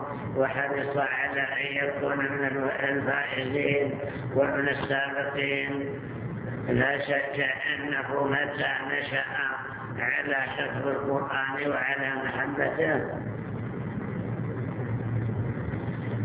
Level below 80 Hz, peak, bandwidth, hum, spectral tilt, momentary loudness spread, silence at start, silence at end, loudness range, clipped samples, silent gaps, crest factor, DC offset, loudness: -54 dBFS; -10 dBFS; 4 kHz; none; -4 dB/octave; 8 LU; 0 s; 0 s; 3 LU; under 0.1%; none; 18 dB; under 0.1%; -28 LUFS